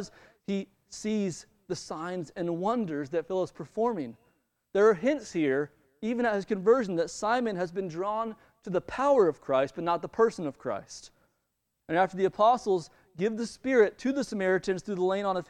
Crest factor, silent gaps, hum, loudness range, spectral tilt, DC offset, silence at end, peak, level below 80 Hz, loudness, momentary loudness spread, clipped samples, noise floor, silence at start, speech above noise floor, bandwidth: 20 dB; none; none; 5 LU; -5.5 dB/octave; under 0.1%; 0.05 s; -10 dBFS; -64 dBFS; -29 LUFS; 13 LU; under 0.1%; -80 dBFS; 0 s; 52 dB; 10.5 kHz